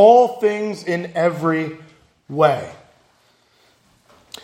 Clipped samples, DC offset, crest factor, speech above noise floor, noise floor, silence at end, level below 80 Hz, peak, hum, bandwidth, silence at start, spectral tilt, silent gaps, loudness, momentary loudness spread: under 0.1%; under 0.1%; 18 dB; 42 dB; -58 dBFS; 1.7 s; -66 dBFS; 0 dBFS; none; 16 kHz; 0 s; -6.5 dB/octave; none; -19 LUFS; 19 LU